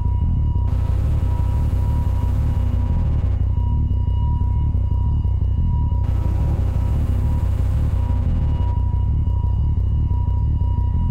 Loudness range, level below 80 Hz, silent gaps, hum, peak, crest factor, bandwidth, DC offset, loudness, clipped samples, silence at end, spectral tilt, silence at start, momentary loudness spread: 0 LU; -20 dBFS; none; none; -10 dBFS; 8 dB; 3.9 kHz; under 0.1%; -21 LUFS; under 0.1%; 0 s; -9.5 dB/octave; 0 s; 0 LU